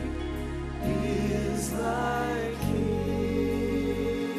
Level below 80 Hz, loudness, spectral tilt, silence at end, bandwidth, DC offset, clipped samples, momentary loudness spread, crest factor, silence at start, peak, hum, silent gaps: -38 dBFS; -29 LUFS; -6 dB/octave; 0 s; 14 kHz; under 0.1%; under 0.1%; 5 LU; 12 dB; 0 s; -16 dBFS; none; none